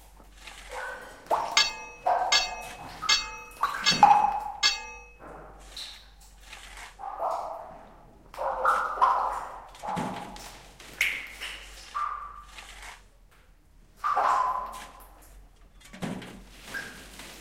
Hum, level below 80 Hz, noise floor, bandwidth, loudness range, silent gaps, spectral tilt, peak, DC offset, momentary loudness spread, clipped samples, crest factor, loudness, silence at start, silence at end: none; -54 dBFS; -58 dBFS; 16 kHz; 10 LU; none; -1 dB/octave; -6 dBFS; under 0.1%; 22 LU; under 0.1%; 26 dB; -27 LUFS; 0 s; 0 s